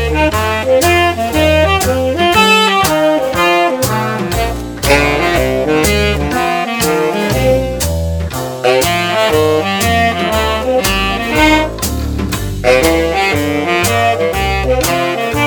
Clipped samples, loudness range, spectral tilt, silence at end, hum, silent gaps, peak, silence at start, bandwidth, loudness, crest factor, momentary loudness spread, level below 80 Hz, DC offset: under 0.1%; 3 LU; -4 dB/octave; 0 s; none; none; 0 dBFS; 0 s; 20 kHz; -12 LUFS; 12 dB; 6 LU; -24 dBFS; under 0.1%